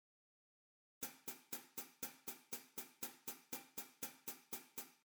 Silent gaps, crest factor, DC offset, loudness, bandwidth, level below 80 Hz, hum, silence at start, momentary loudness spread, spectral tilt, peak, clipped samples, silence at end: none; 22 dB; under 0.1%; -50 LUFS; over 20 kHz; -90 dBFS; none; 1 s; 4 LU; -1 dB/octave; -32 dBFS; under 0.1%; 0.1 s